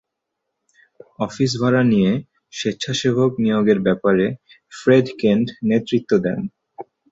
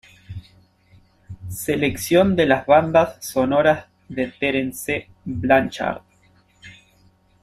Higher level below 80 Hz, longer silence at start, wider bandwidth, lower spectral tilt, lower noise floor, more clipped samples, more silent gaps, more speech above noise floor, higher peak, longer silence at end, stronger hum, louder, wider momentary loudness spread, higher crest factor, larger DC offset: about the same, -56 dBFS vs -52 dBFS; first, 1.2 s vs 0.3 s; second, 8 kHz vs 15.5 kHz; about the same, -6 dB/octave vs -5.5 dB/octave; first, -79 dBFS vs -57 dBFS; neither; neither; first, 61 dB vs 38 dB; about the same, -2 dBFS vs -2 dBFS; second, 0.3 s vs 0.7 s; neither; about the same, -19 LUFS vs -20 LUFS; second, 13 LU vs 19 LU; about the same, 18 dB vs 18 dB; neither